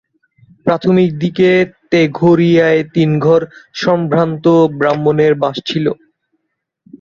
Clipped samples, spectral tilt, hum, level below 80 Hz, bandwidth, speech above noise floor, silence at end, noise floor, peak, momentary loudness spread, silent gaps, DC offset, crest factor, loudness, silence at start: under 0.1%; -7.5 dB/octave; none; -52 dBFS; 7.2 kHz; 61 dB; 1.05 s; -73 dBFS; 0 dBFS; 7 LU; none; under 0.1%; 14 dB; -13 LUFS; 0.65 s